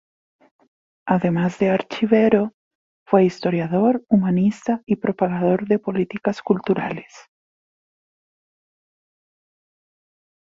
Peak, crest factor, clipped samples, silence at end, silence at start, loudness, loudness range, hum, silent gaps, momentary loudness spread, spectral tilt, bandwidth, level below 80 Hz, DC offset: -2 dBFS; 18 dB; under 0.1%; 3.2 s; 1.05 s; -20 LUFS; 8 LU; none; 2.54-3.06 s; 7 LU; -8 dB/octave; 7.6 kHz; -60 dBFS; under 0.1%